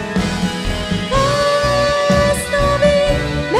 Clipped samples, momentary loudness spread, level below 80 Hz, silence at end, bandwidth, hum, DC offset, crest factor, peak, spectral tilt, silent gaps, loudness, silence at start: under 0.1%; 6 LU; -28 dBFS; 0 s; 15 kHz; none; under 0.1%; 14 dB; -2 dBFS; -5 dB/octave; none; -16 LUFS; 0 s